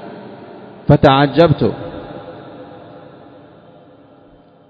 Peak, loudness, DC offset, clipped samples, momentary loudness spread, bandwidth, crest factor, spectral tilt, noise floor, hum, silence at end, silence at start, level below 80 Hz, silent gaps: 0 dBFS; -13 LUFS; under 0.1%; 0.1%; 26 LU; 6.2 kHz; 18 dB; -9 dB/octave; -46 dBFS; none; 2.05 s; 0 s; -40 dBFS; none